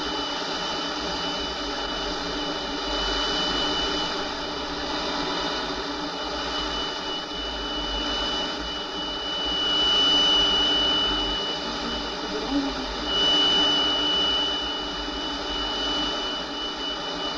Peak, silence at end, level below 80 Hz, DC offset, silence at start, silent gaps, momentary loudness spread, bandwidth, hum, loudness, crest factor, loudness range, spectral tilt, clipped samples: -10 dBFS; 0 s; -42 dBFS; under 0.1%; 0 s; none; 11 LU; 10.5 kHz; none; -24 LUFS; 16 dB; 7 LU; -2.5 dB/octave; under 0.1%